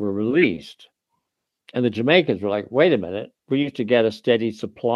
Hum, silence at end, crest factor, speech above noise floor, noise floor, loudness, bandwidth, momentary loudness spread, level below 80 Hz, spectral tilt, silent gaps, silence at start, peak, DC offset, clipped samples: none; 0 s; 20 dB; 58 dB; -79 dBFS; -21 LUFS; 9.8 kHz; 11 LU; -64 dBFS; -7 dB/octave; none; 0 s; -2 dBFS; under 0.1%; under 0.1%